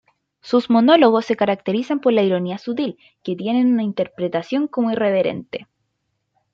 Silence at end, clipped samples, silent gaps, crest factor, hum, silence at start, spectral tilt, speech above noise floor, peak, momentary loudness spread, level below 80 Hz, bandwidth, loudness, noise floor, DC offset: 0.9 s; under 0.1%; none; 18 dB; none; 0.45 s; -7 dB/octave; 55 dB; -2 dBFS; 13 LU; -68 dBFS; 7.2 kHz; -19 LUFS; -73 dBFS; under 0.1%